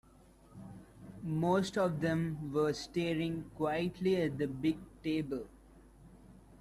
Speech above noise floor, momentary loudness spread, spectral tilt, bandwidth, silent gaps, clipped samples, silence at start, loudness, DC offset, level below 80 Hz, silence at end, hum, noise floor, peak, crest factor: 27 dB; 20 LU; -6.5 dB/octave; 14 kHz; none; under 0.1%; 0.55 s; -35 LUFS; under 0.1%; -60 dBFS; 0.05 s; none; -61 dBFS; -20 dBFS; 16 dB